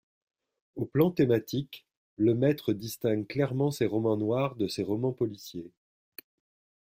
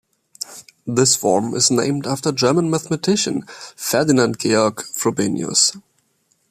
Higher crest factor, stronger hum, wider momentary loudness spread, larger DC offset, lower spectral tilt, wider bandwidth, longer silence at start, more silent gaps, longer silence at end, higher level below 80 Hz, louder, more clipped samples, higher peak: about the same, 20 dB vs 18 dB; neither; first, 20 LU vs 14 LU; neither; first, -7 dB/octave vs -3.5 dB/octave; about the same, 16 kHz vs 15.5 kHz; first, 0.75 s vs 0.5 s; first, 1.97-2.17 s vs none; first, 1.2 s vs 0.7 s; second, -66 dBFS vs -60 dBFS; second, -29 LUFS vs -18 LUFS; neither; second, -10 dBFS vs -2 dBFS